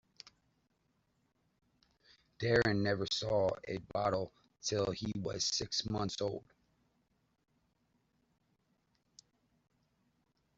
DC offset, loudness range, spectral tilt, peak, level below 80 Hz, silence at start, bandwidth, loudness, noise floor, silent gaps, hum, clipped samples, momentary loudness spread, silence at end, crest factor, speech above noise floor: under 0.1%; 8 LU; -4 dB/octave; -16 dBFS; -64 dBFS; 2.4 s; 8 kHz; -35 LUFS; -78 dBFS; none; none; under 0.1%; 9 LU; 4.15 s; 24 dB; 43 dB